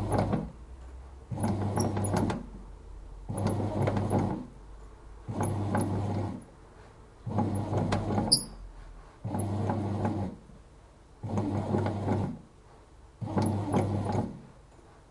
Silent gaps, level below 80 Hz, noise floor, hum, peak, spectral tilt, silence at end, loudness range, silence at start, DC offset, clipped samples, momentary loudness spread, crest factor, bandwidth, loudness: none; -48 dBFS; -54 dBFS; none; -6 dBFS; -6 dB/octave; 0.05 s; 4 LU; 0 s; under 0.1%; under 0.1%; 20 LU; 26 dB; 11.5 kHz; -31 LUFS